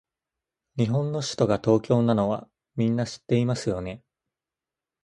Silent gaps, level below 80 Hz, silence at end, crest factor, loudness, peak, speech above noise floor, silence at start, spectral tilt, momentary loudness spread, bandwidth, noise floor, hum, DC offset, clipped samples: none; -56 dBFS; 1.05 s; 20 dB; -25 LUFS; -6 dBFS; 66 dB; 0.75 s; -7 dB/octave; 14 LU; 11.5 kHz; -90 dBFS; none; under 0.1%; under 0.1%